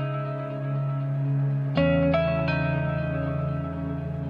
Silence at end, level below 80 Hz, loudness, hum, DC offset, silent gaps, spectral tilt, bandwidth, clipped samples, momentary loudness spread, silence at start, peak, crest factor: 0 s; -48 dBFS; -26 LUFS; none; under 0.1%; none; -10 dB/octave; 5.4 kHz; under 0.1%; 9 LU; 0 s; -12 dBFS; 14 dB